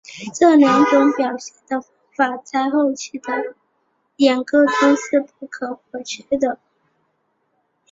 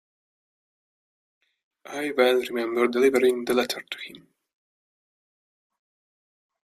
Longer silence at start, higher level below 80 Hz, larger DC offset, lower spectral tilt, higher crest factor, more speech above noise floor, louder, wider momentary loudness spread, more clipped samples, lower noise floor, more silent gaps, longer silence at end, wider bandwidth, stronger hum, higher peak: second, 0.1 s vs 1.85 s; first, -64 dBFS vs -72 dBFS; neither; about the same, -4 dB/octave vs -3.5 dB/octave; second, 16 dB vs 22 dB; second, 50 dB vs over 66 dB; first, -18 LUFS vs -23 LUFS; about the same, 18 LU vs 16 LU; neither; second, -68 dBFS vs under -90 dBFS; neither; second, 1.35 s vs 2.5 s; second, 7.8 kHz vs 15.5 kHz; neither; first, -2 dBFS vs -6 dBFS